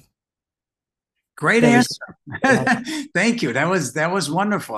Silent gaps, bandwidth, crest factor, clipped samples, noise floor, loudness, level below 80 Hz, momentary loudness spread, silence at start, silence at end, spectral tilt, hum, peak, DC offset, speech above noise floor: none; 13.5 kHz; 20 dB; under 0.1%; -89 dBFS; -19 LUFS; -60 dBFS; 9 LU; 1.4 s; 0 s; -4.5 dB/octave; none; -2 dBFS; under 0.1%; 70 dB